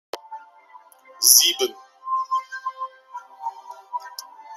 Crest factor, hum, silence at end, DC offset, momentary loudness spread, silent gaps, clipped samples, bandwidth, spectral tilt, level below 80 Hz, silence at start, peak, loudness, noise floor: 26 dB; none; 0 s; under 0.1%; 27 LU; none; under 0.1%; 16.5 kHz; 3.5 dB/octave; -84 dBFS; 0.15 s; 0 dBFS; -18 LUFS; -50 dBFS